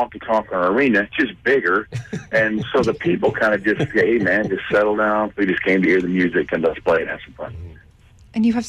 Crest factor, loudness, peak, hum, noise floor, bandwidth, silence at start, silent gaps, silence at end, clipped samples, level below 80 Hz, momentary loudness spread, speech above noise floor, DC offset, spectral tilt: 12 dB; -19 LUFS; -8 dBFS; none; -48 dBFS; 10.5 kHz; 0 s; none; 0 s; under 0.1%; -48 dBFS; 12 LU; 29 dB; under 0.1%; -6.5 dB/octave